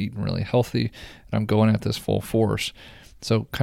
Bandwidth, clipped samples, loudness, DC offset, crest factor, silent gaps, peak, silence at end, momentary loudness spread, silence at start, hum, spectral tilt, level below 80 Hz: 16 kHz; under 0.1%; -24 LUFS; under 0.1%; 16 dB; none; -6 dBFS; 0 s; 10 LU; 0 s; none; -6.5 dB/octave; -48 dBFS